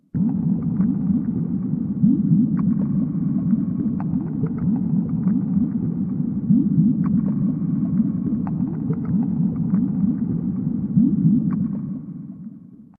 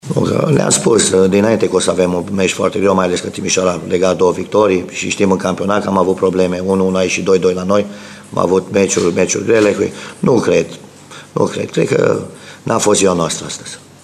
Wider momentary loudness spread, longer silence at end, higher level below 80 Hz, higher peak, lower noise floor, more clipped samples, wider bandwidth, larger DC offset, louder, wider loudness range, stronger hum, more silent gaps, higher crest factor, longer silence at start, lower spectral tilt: second, 6 LU vs 9 LU; about the same, 0.15 s vs 0.25 s; about the same, -48 dBFS vs -50 dBFS; second, -6 dBFS vs 0 dBFS; first, -42 dBFS vs -36 dBFS; neither; second, 2.3 kHz vs 13.5 kHz; neither; second, -21 LUFS vs -14 LUFS; about the same, 1 LU vs 3 LU; neither; neither; about the same, 14 dB vs 14 dB; about the same, 0.15 s vs 0.05 s; first, -15 dB/octave vs -4.5 dB/octave